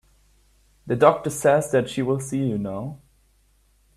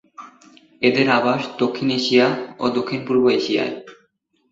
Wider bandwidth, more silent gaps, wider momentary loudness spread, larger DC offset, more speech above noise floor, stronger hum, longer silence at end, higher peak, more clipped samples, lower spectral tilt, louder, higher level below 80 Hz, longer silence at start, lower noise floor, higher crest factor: first, 14.5 kHz vs 7.8 kHz; neither; first, 12 LU vs 7 LU; neither; second, 40 dB vs 46 dB; neither; first, 1 s vs 0.6 s; about the same, -2 dBFS vs -2 dBFS; neither; about the same, -6 dB/octave vs -5.5 dB/octave; second, -22 LUFS vs -19 LUFS; first, -56 dBFS vs -62 dBFS; first, 0.85 s vs 0.2 s; second, -61 dBFS vs -65 dBFS; about the same, 22 dB vs 18 dB